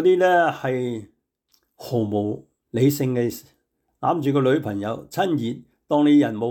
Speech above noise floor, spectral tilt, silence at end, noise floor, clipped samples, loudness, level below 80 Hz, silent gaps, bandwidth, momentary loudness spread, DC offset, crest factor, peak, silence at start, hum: 46 dB; -6.5 dB/octave; 0 s; -67 dBFS; under 0.1%; -22 LUFS; -66 dBFS; none; 19 kHz; 14 LU; under 0.1%; 14 dB; -8 dBFS; 0 s; none